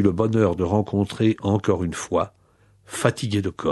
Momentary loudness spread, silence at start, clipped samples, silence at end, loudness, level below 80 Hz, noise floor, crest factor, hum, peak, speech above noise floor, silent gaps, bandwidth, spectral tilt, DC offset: 5 LU; 0 s; under 0.1%; 0 s; -23 LUFS; -48 dBFS; -58 dBFS; 20 dB; none; -2 dBFS; 36 dB; none; 12 kHz; -6.5 dB/octave; under 0.1%